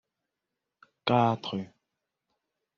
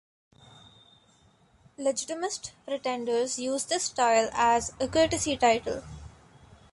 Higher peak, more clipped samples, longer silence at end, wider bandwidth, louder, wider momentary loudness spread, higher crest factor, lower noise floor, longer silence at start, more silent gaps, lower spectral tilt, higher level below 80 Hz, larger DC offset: about the same, -8 dBFS vs -10 dBFS; neither; first, 1.15 s vs 0.6 s; second, 6.8 kHz vs 11.5 kHz; about the same, -28 LUFS vs -27 LUFS; about the same, 14 LU vs 12 LU; about the same, 24 dB vs 20 dB; first, -86 dBFS vs -62 dBFS; second, 1.05 s vs 1.8 s; neither; first, -5 dB/octave vs -2.5 dB/octave; second, -74 dBFS vs -54 dBFS; neither